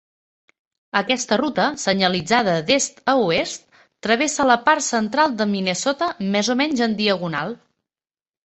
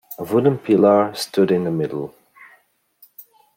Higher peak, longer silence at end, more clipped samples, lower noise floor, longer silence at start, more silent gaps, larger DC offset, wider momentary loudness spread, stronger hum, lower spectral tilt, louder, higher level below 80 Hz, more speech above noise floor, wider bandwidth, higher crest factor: about the same, -2 dBFS vs -2 dBFS; first, 0.9 s vs 0.35 s; neither; first, under -90 dBFS vs -58 dBFS; first, 0.95 s vs 0.1 s; neither; neither; second, 7 LU vs 12 LU; neither; second, -3.5 dB/octave vs -6.5 dB/octave; about the same, -20 LUFS vs -18 LUFS; first, -60 dBFS vs -66 dBFS; first, over 70 dB vs 41 dB; second, 8.6 kHz vs 16.5 kHz; about the same, 20 dB vs 18 dB